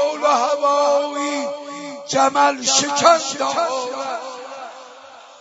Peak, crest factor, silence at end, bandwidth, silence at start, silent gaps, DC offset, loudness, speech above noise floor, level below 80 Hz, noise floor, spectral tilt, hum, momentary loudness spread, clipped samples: 0 dBFS; 20 dB; 0.05 s; 8 kHz; 0 s; none; under 0.1%; -18 LUFS; 24 dB; -70 dBFS; -42 dBFS; -1.5 dB/octave; none; 18 LU; under 0.1%